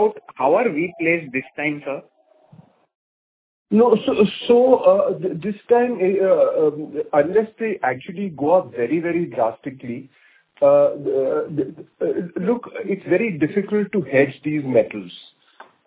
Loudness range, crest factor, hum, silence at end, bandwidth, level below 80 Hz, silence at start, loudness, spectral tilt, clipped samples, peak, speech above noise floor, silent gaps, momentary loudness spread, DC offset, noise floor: 5 LU; 18 dB; none; 0.65 s; 4 kHz; -64 dBFS; 0 s; -20 LUFS; -10.5 dB/octave; under 0.1%; -2 dBFS; 31 dB; 2.95-3.66 s; 12 LU; under 0.1%; -50 dBFS